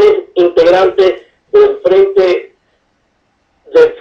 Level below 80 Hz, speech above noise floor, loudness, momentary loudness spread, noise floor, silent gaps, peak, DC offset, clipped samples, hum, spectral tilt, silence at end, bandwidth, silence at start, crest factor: -48 dBFS; 51 dB; -10 LUFS; 5 LU; -59 dBFS; none; 0 dBFS; under 0.1%; under 0.1%; none; -5.5 dB/octave; 0.05 s; 7 kHz; 0 s; 10 dB